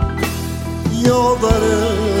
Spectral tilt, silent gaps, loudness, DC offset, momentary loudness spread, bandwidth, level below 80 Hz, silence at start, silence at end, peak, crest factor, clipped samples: -5.5 dB/octave; none; -17 LUFS; under 0.1%; 8 LU; 16.5 kHz; -26 dBFS; 0 s; 0 s; -2 dBFS; 14 dB; under 0.1%